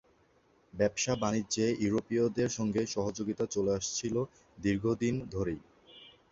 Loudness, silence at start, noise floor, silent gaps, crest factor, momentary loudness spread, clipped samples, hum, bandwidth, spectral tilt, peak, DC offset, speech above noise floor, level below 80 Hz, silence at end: -32 LUFS; 0.75 s; -67 dBFS; none; 18 dB; 6 LU; under 0.1%; none; 8 kHz; -5 dB/octave; -14 dBFS; under 0.1%; 35 dB; -58 dBFS; 0.2 s